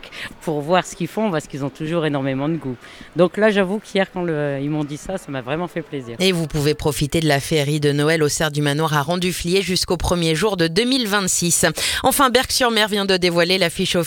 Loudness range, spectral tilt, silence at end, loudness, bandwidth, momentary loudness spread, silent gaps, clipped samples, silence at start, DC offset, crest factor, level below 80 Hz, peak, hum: 5 LU; -4 dB/octave; 0 s; -19 LUFS; 19 kHz; 11 LU; none; under 0.1%; 0 s; under 0.1%; 20 dB; -42 dBFS; 0 dBFS; none